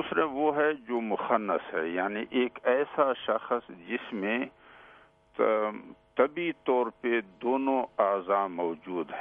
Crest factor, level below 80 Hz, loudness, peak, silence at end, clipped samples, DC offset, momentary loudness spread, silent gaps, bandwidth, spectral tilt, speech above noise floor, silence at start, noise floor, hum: 20 dB; -72 dBFS; -29 LUFS; -8 dBFS; 0 s; under 0.1%; under 0.1%; 8 LU; none; 3.8 kHz; -8 dB/octave; 29 dB; 0 s; -58 dBFS; none